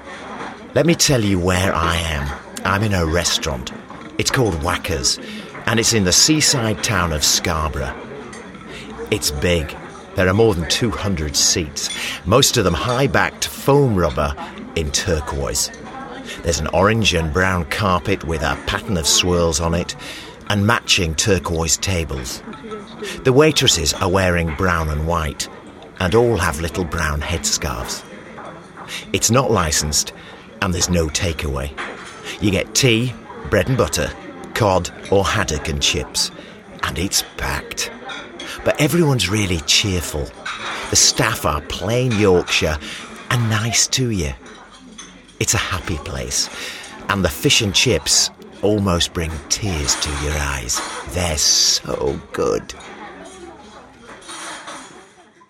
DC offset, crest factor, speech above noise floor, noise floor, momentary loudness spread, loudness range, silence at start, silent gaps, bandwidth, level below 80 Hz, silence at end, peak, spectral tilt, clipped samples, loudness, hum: under 0.1%; 20 dB; 28 dB; -47 dBFS; 17 LU; 4 LU; 0 s; none; 16.5 kHz; -34 dBFS; 0.45 s; 0 dBFS; -3.5 dB/octave; under 0.1%; -18 LUFS; none